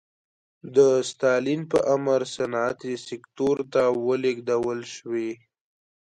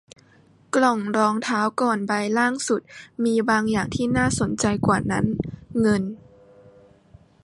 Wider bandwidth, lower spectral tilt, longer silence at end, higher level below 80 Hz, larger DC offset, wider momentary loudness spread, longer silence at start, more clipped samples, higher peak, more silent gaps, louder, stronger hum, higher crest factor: about the same, 11 kHz vs 11.5 kHz; about the same, -5 dB/octave vs -5 dB/octave; second, 0.7 s vs 1.25 s; second, -64 dBFS vs -48 dBFS; neither; first, 12 LU vs 6 LU; about the same, 0.65 s vs 0.75 s; neither; about the same, -6 dBFS vs -4 dBFS; neither; about the same, -24 LUFS vs -22 LUFS; neither; about the same, 18 dB vs 18 dB